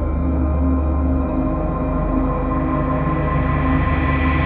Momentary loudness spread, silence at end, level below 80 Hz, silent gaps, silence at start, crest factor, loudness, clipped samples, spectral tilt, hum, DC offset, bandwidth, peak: 3 LU; 0 s; -22 dBFS; none; 0 s; 12 dB; -20 LUFS; under 0.1%; -11.5 dB/octave; none; under 0.1%; 4 kHz; -6 dBFS